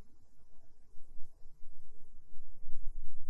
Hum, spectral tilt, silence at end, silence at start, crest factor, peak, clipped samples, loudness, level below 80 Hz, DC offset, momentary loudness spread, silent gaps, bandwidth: none; -7.5 dB/octave; 0 s; 0 s; 12 dB; -16 dBFS; under 0.1%; -58 LUFS; -48 dBFS; under 0.1%; 14 LU; none; 0.7 kHz